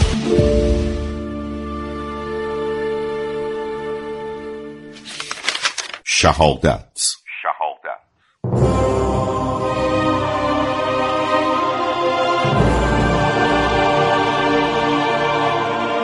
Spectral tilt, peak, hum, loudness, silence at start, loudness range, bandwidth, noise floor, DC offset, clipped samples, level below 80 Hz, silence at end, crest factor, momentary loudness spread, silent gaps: -4.5 dB/octave; 0 dBFS; none; -18 LUFS; 0 s; 8 LU; 11.5 kHz; -44 dBFS; under 0.1%; under 0.1%; -30 dBFS; 0 s; 18 dB; 11 LU; none